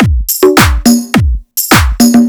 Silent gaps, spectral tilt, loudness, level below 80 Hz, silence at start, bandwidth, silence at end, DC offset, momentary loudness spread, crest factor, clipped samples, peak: none; -4.5 dB/octave; -8 LUFS; -16 dBFS; 0 s; over 20 kHz; 0 s; under 0.1%; 6 LU; 8 dB; 3%; 0 dBFS